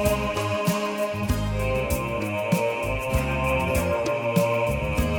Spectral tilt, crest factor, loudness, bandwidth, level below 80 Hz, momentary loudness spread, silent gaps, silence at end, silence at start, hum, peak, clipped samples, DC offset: -5.5 dB/octave; 16 dB; -25 LUFS; over 20 kHz; -34 dBFS; 3 LU; none; 0 s; 0 s; none; -8 dBFS; under 0.1%; under 0.1%